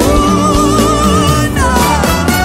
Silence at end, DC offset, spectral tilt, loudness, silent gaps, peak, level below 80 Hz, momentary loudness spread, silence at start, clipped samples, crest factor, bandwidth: 0 s; under 0.1%; -5 dB/octave; -10 LUFS; none; 0 dBFS; -18 dBFS; 2 LU; 0 s; under 0.1%; 10 dB; 16.5 kHz